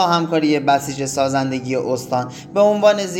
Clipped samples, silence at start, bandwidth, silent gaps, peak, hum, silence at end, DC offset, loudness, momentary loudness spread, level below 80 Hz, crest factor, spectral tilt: under 0.1%; 0 s; 17 kHz; none; -2 dBFS; none; 0 s; under 0.1%; -18 LUFS; 9 LU; -58 dBFS; 16 dB; -5 dB/octave